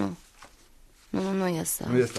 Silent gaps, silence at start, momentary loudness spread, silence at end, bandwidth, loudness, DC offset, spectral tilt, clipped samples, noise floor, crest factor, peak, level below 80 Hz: none; 0 s; 9 LU; 0 s; 13.5 kHz; -29 LUFS; under 0.1%; -5 dB/octave; under 0.1%; -55 dBFS; 20 dB; -10 dBFS; -58 dBFS